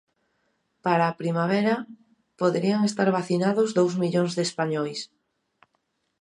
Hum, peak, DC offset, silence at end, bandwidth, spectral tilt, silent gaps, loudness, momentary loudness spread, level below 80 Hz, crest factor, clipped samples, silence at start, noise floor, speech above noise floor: none; -6 dBFS; under 0.1%; 1.15 s; 11 kHz; -6 dB/octave; none; -24 LUFS; 8 LU; -74 dBFS; 20 dB; under 0.1%; 0.85 s; -74 dBFS; 51 dB